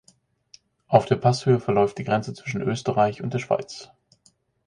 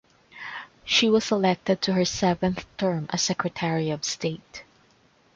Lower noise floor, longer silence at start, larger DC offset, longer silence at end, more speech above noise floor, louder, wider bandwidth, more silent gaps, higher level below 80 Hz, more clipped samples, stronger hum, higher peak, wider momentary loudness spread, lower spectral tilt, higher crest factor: about the same, -63 dBFS vs -61 dBFS; first, 0.9 s vs 0.35 s; neither; about the same, 0.8 s vs 0.75 s; first, 41 dB vs 36 dB; about the same, -23 LUFS vs -24 LUFS; first, 10.5 kHz vs 7.8 kHz; neither; about the same, -58 dBFS vs -56 dBFS; neither; neither; first, -2 dBFS vs -8 dBFS; second, 9 LU vs 16 LU; first, -6.5 dB/octave vs -4 dB/octave; about the same, 22 dB vs 18 dB